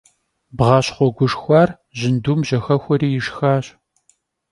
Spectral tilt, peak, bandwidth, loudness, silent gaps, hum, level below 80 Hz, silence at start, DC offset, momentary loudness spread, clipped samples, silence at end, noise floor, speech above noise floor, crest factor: -7 dB/octave; 0 dBFS; 11.5 kHz; -18 LUFS; none; none; -48 dBFS; 0.55 s; under 0.1%; 7 LU; under 0.1%; 0.85 s; -62 dBFS; 45 dB; 18 dB